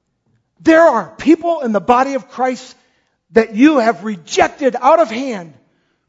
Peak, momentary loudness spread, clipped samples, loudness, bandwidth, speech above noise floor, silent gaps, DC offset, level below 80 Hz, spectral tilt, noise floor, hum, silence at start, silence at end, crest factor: 0 dBFS; 11 LU; under 0.1%; -14 LUFS; 7.8 kHz; 49 dB; none; under 0.1%; -52 dBFS; -5 dB/octave; -63 dBFS; none; 0.65 s; 0.6 s; 14 dB